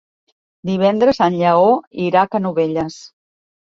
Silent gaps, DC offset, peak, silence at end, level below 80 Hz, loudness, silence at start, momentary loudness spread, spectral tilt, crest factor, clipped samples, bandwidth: 1.87-1.91 s; under 0.1%; -2 dBFS; 0.6 s; -54 dBFS; -16 LUFS; 0.65 s; 10 LU; -7 dB/octave; 16 dB; under 0.1%; 7.8 kHz